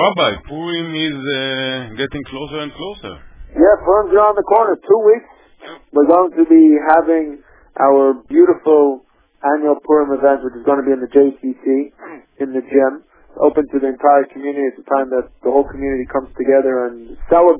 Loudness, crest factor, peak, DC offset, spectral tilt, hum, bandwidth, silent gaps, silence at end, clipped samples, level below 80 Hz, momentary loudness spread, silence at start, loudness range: -15 LUFS; 14 dB; 0 dBFS; under 0.1%; -9.5 dB/octave; none; 3.8 kHz; none; 0 s; under 0.1%; -44 dBFS; 14 LU; 0 s; 5 LU